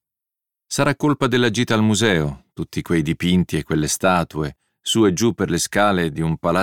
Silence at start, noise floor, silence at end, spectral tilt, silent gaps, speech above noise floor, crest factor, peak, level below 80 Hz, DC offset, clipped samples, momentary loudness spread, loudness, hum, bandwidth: 0.7 s; -86 dBFS; 0 s; -5 dB/octave; none; 67 dB; 16 dB; -2 dBFS; -44 dBFS; under 0.1%; under 0.1%; 10 LU; -19 LUFS; none; 17.5 kHz